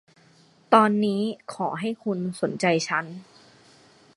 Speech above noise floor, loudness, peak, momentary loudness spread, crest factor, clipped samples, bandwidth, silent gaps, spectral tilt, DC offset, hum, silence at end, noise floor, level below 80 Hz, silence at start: 33 dB; -24 LUFS; -2 dBFS; 12 LU; 24 dB; under 0.1%; 11.5 kHz; none; -5.5 dB/octave; under 0.1%; none; 0.95 s; -57 dBFS; -72 dBFS; 0.7 s